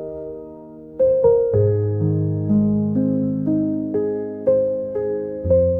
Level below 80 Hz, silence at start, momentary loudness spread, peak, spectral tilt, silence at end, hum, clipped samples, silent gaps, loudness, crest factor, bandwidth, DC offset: -46 dBFS; 0 s; 15 LU; -6 dBFS; -14 dB/octave; 0 s; none; under 0.1%; none; -20 LUFS; 14 dB; 2.2 kHz; under 0.1%